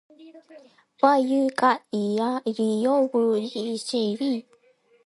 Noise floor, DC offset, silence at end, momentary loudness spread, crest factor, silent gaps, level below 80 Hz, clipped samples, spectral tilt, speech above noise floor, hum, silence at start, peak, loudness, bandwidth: -61 dBFS; under 0.1%; 0.65 s; 7 LU; 20 dB; none; -78 dBFS; under 0.1%; -5.5 dB/octave; 37 dB; none; 0.2 s; -4 dBFS; -24 LUFS; 11.5 kHz